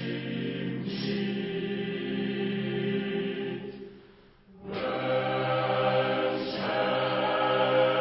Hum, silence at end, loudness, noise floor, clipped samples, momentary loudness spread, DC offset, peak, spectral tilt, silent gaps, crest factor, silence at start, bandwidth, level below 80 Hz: none; 0 s; -29 LUFS; -55 dBFS; under 0.1%; 9 LU; under 0.1%; -12 dBFS; -10 dB/octave; none; 16 dB; 0 s; 5.8 kHz; -64 dBFS